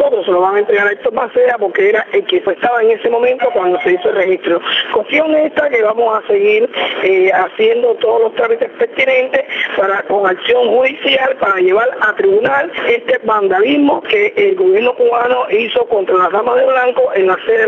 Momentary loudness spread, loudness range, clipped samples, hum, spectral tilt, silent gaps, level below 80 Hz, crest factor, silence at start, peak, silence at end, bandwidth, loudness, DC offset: 3 LU; 1 LU; under 0.1%; none; -5.5 dB/octave; none; -58 dBFS; 12 dB; 0 s; 0 dBFS; 0 s; 6.2 kHz; -12 LUFS; under 0.1%